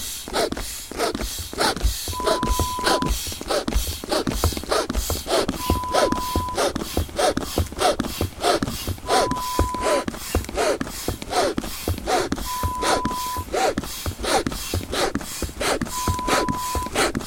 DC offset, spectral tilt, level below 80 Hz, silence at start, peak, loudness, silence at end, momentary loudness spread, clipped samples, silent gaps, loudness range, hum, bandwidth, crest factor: under 0.1%; -3.5 dB/octave; -32 dBFS; 0 s; -4 dBFS; -24 LUFS; 0 s; 6 LU; under 0.1%; none; 1 LU; none; 17.5 kHz; 20 dB